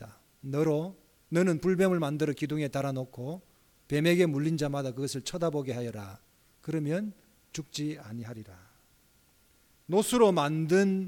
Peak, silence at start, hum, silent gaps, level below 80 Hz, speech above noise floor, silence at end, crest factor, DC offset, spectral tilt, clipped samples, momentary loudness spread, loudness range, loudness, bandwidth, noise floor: -10 dBFS; 0 s; none; none; -64 dBFS; 36 dB; 0 s; 20 dB; under 0.1%; -6 dB/octave; under 0.1%; 17 LU; 9 LU; -29 LUFS; 18.5 kHz; -65 dBFS